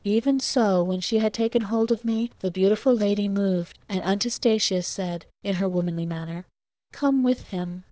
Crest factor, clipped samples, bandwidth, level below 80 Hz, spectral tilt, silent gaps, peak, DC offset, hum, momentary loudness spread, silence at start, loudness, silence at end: 14 dB; under 0.1%; 8 kHz; -60 dBFS; -5.5 dB/octave; none; -10 dBFS; under 0.1%; none; 9 LU; 0.05 s; -24 LUFS; 0.1 s